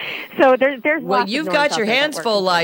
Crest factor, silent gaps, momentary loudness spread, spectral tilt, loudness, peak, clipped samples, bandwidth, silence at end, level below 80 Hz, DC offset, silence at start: 12 dB; none; 5 LU; -3.5 dB/octave; -17 LUFS; -4 dBFS; under 0.1%; 17 kHz; 0 s; -66 dBFS; under 0.1%; 0 s